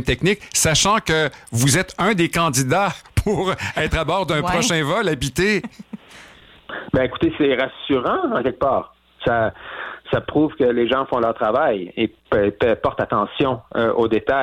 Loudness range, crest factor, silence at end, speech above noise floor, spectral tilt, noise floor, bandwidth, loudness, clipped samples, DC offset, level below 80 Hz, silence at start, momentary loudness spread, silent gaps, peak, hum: 3 LU; 14 dB; 0 s; 26 dB; -4 dB/octave; -46 dBFS; 16.5 kHz; -19 LUFS; under 0.1%; under 0.1%; -40 dBFS; 0 s; 7 LU; none; -4 dBFS; none